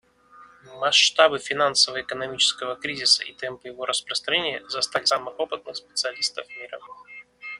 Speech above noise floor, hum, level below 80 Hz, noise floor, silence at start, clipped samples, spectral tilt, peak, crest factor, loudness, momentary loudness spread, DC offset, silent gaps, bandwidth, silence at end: 27 dB; none; -68 dBFS; -51 dBFS; 0.4 s; under 0.1%; -0.5 dB/octave; -2 dBFS; 22 dB; -22 LUFS; 18 LU; under 0.1%; none; 12 kHz; 0 s